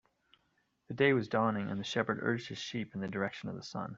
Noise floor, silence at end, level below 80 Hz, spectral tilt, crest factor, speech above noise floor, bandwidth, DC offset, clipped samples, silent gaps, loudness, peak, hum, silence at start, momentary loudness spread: -77 dBFS; 0 s; -72 dBFS; -6 dB/octave; 20 dB; 43 dB; 7.8 kHz; under 0.1%; under 0.1%; none; -34 LUFS; -14 dBFS; none; 0.9 s; 12 LU